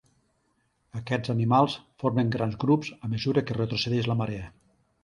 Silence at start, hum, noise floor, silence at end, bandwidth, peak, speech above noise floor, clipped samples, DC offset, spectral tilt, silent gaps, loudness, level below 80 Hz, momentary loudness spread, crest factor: 0.95 s; none; -71 dBFS; 0.55 s; 10.5 kHz; -8 dBFS; 45 dB; under 0.1%; under 0.1%; -7 dB/octave; none; -27 LUFS; -56 dBFS; 11 LU; 20 dB